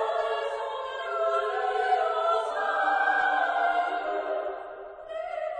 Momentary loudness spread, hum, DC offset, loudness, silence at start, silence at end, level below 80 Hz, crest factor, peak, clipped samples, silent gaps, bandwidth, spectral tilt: 12 LU; none; under 0.1%; -27 LUFS; 0 s; 0 s; -68 dBFS; 14 dB; -14 dBFS; under 0.1%; none; 9.6 kHz; -2 dB/octave